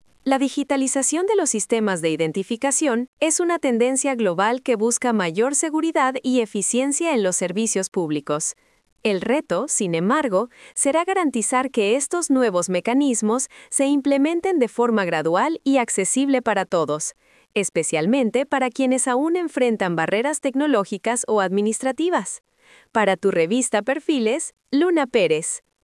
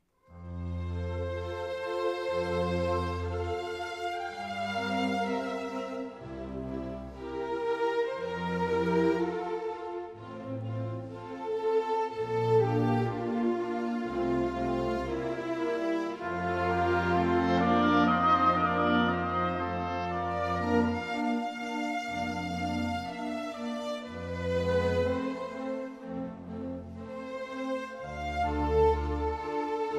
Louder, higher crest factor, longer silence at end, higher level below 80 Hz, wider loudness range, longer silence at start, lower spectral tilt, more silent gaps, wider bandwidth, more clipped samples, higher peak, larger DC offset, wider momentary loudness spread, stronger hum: first, -21 LUFS vs -31 LUFS; about the same, 16 dB vs 18 dB; first, 0.25 s vs 0 s; second, -68 dBFS vs -48 dBFS; second, 2 LU vs 7 LU; about the same, 0.25 s vs 0.3 s; second, -3.5 dB/octave vs -7 dB/octave; first, 3.08-3.17 s, 7.88-7.92 s, 8.92-8.96 s vs none; about the same, 12 kHz vs 12.5 kHz; neither; first, -4 dBFS vs -12 dBFS; neither; second, 5 LU vs 13 LU; neither